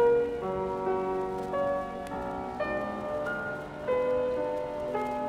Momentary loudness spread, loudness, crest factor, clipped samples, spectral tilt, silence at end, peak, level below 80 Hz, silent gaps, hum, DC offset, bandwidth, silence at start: 7 LU; -31 LUFS; 14 dB; under 0.1%; -7 dB/octave; 0 s; -16 dBFS; -54 dBFS; none; none; under 0.1%; 12 kHz; 0 s